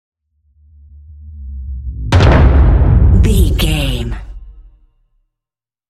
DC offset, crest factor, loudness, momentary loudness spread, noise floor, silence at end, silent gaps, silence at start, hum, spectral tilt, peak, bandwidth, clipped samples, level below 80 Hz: under 0.1%; 14 dB; -12 LUFS; 20 LU; -88 dBFS; 1.3 s; none; 1.1 s; none; -6.5 dB/octave; 0 dBFS; 14 kHz; under 0.1%; -16 dBFS